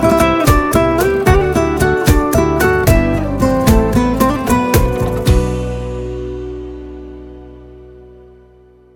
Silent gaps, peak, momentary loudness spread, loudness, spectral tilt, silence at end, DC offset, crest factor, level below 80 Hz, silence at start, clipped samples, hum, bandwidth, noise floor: none; 0 dBFS; 16 LU; -14 LUFS; -6 dB/octave; 0.9 s; under 0.1%; 14 dB; -22 dBFS; 0 s; under 0.1%; none; 17.5 kHz; -45 dBFS